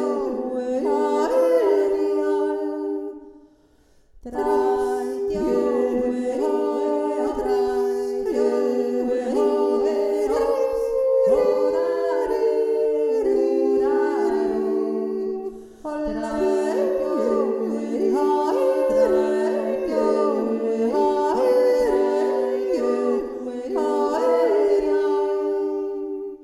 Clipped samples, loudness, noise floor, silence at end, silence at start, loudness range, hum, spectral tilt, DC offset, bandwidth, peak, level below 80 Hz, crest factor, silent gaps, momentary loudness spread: under 0.1%; -22 LUFS; -56 dBFS; 0 s; 0 s; 3 LU; none; -5.5 dB/octave; under 0.1%; 13 kHz; -8 dBFS; -52 dBFS; 14 dB; none; 7 LU